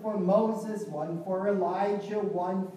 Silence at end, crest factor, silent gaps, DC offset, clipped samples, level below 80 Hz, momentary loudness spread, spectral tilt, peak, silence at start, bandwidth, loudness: 0 s; 16 dB; none; under 0.1%; under 0.1%; -82 dBFS; 9 LU; -8 dB/octave; -12 dBFS; 0 s; 13.5 kHz; -29 LUFS